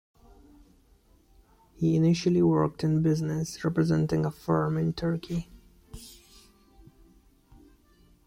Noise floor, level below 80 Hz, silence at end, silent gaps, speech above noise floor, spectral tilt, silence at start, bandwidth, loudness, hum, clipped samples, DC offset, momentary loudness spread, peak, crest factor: -61 dBFS; -54 dBFS; 2.15 s; none; 35 dB; -7.5 dB/octave; 1.8 s; 14.5 kHz; -27 LUFS; none; under 0.1%; under 0.1%; 20 LU; -12 dBFS; 16 dB